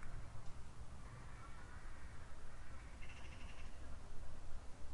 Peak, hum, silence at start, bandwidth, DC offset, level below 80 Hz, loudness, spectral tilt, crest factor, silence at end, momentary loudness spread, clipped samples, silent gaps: -32 dBFS; none; 0 s; 11 kHz; under 0.1%; -52 dBFS; -57 LUFS; -5 dB/octave; 12 dB; 0 s; 2 LU; under 0.1%; none